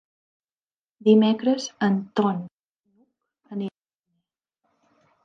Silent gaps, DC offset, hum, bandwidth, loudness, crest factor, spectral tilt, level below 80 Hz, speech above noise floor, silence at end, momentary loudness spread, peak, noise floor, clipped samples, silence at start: 2.54-2.59 s, 2.70-2.84 s; under 0.1%; none; 7.6 kHz; -23 LUFS; 20 dB; -6 dB/octave; -78 dBFS; over 69 dB; 1.55 s; 17 LU; -6 dBFS; under -90 dBFS; under 0.1%; 1.05 s